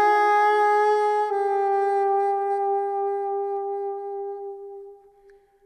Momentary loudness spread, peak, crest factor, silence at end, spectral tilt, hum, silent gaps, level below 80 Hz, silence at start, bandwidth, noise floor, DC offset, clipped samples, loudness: 15 LU; -12 dBFS; 12 dB; 0.7 s; -2.5 dB/octave; none; none; -74 dBFS; 0 s; 9.8 kHz; -55 dBFS; under 0.1%; under 0.1%; -23 LUFS